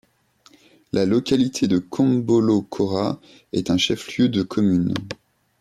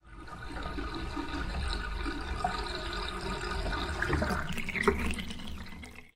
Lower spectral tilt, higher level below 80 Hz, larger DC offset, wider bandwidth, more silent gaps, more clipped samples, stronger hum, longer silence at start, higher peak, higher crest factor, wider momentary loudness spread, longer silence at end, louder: about the same, -6 dB/octave vs -5 dB/octave; second, -56 dBFS vs -40 dBFS; neither; second, 13.5 kHz vs 16 kHz; neither; neither; neither; first, 0.95 s vs 0.05 s; about the same, -8 dBFS vs -10 dBFS; second, 14 dB vs 24 dB; second, 9 LU vs 13 LU; first, 0.45 s vs 0.05 s; first, -21 LUFS vs -35 LUFS